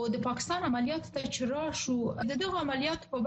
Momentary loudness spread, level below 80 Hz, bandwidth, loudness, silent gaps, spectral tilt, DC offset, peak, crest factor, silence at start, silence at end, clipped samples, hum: 3 LU; -58 dBFS; 8.4 kHz; -32 LUFS; none; -4 dB/octave; under 0.1%; -18 dBFS; 14 dB; 0 s; 0 s; under 0.1%; none